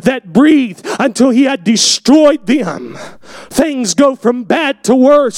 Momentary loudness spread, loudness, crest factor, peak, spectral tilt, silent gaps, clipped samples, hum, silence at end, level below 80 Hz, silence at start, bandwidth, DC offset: 12 LU; -11 LUFS; 10 dB; 0 dBFS; -3.5 dB/octave; none; under 0.1%; none; 0 s; -48 dBFS; 0.05 s; 16 kHz; under 0.1%